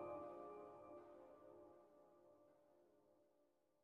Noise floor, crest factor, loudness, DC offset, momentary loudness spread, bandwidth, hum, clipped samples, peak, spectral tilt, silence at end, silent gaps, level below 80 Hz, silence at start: -82 dBFS; 20 dB; -59 LUFS; under 0.1%; 12 LU; 4.8 kHz; none; under 0.1%; -40 dBFS; -6.5 dB/octave; 0 s; none; under -90 dBFS; 0 s